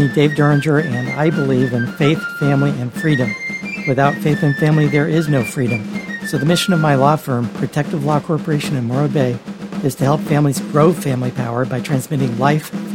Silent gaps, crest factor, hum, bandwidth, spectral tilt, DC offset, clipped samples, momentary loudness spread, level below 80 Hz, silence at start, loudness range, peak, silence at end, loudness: none; 16 dB; none; 16.5 kHz; -6.5 dB/octave; under 0.1%; under 0.1%; 7 LU; -54 dBFS; 0 s; 2 LU; 0 dBFS; 0 s; -17 LUFS